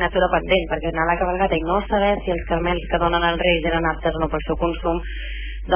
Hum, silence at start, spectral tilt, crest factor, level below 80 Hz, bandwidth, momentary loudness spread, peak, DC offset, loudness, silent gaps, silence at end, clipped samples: none; 0 s; -9.5 dB/octave; 16 dB; -30 dBFS; 3.5 kHz; 6 LU; -4 dBFS; under 0.1%; -21 LUFS; none; 0 s; under 0.1%